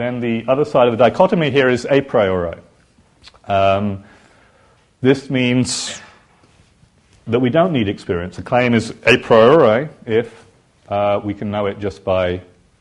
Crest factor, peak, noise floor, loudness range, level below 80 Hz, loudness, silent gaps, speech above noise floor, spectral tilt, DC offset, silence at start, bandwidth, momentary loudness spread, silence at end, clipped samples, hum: 18 dB; 0 dBFS; -53 dBFS; 6 LU; -50 dBFS; -16 LUFS; none; 38 dB; -5.5 dB/octave; under 0.1%; 0 s; 11.5 kHz; 12 LU; 0.4 s; under 0.1%; none